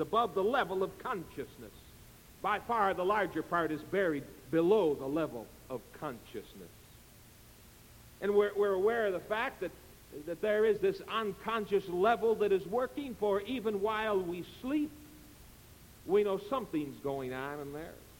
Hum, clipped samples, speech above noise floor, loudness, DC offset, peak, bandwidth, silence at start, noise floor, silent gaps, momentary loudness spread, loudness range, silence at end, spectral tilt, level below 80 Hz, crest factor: none; under 0.1%; 24 dB; -33 LUFS; under 0.1%; -16 dBFS; 17 kHz; 0 s; -57 dBFS; none; 16 LU; 5 LU; 0.05 s; -6 dB/octave; -62 dBFS; 18 dB